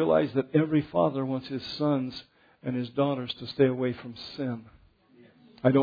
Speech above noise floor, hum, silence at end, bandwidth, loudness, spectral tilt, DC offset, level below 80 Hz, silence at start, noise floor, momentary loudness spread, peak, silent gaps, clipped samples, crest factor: 30 dB; none; 0 s; 5 kHz; -28 LUFS; -8.5 dB/octave; under 0.1%; -64 dBFS; 0 s; -58 dBFS; 12 LU; -6 dBFS; none; under 0.1%; 22 dB